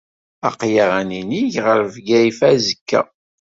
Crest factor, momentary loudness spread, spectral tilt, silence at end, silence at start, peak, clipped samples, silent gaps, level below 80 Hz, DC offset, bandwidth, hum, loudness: 16 dB; 9 LU; -5 dB/octave; 0.35 s; 0.45 s; -2 dBFS; under 0.1%; 2.81-2.86 s; -58 dBFS; under 0.1%; 7.8 kHz; none; -17 LUFS